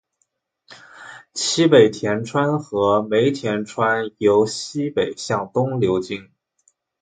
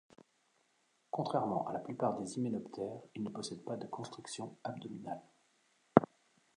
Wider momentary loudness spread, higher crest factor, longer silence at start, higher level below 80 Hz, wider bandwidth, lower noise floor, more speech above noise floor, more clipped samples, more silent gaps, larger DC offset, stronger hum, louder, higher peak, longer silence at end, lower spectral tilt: about the same, 14 LU vs 15 LU; second, 20 dB vs 34 dB; second, 0.7 s vs 1.15 s; first, -58 dBFS vs -74 dBFS; second, 9.4 kHz vs 10.5 kHz; second, -71 dBFS vs -76 dBFS; first, 52 dB vs 36 dB; neither; neither; neither; neither; first, -19 LUFS vs -38 LUFS; first, 0 dBFS vs -6 dBFS; first, 0.8 s vs 0.5 s; about the same, -5 dB/octave vs -6 dB/octave